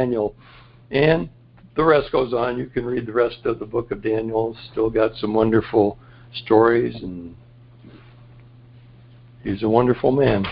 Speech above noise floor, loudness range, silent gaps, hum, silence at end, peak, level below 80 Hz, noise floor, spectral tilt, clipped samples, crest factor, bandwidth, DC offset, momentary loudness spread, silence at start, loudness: 27 dB; 4 LU; none; none; 0 s; -2 dBFS; -46 dBFS; -46 dBFS; -11.5 dB/octave; under 0.1%; 20 dB; 5.2 kHz; under 0.1%; 13 LU; 0 s; -20 LUFS